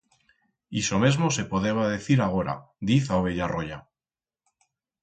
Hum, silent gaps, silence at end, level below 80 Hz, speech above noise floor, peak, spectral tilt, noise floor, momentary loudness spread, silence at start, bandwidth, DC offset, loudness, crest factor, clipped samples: none; none; 1.2 s; -50 dBFS; over 65 dB; -6 dBFS; -5.5 dB/octave; under -90 dBFS; 10 LU; 0.7 s; 9.2 kHz; under 0.1%; -25 LUFS; 20 dB; under 0.1%